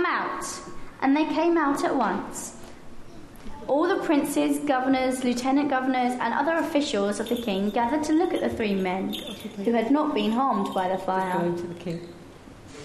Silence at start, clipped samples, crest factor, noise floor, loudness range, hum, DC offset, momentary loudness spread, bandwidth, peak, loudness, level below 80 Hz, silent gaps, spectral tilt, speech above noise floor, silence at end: 0 s; under 0.1%; 16 dB; -45 dBFS; 2 LU; none; under 0.1%; 13 LU; 13 kHz; -10 dBFS; -25 LUFS; -52 dBFS; none; -5 dB/octave; 21 dB; 0 s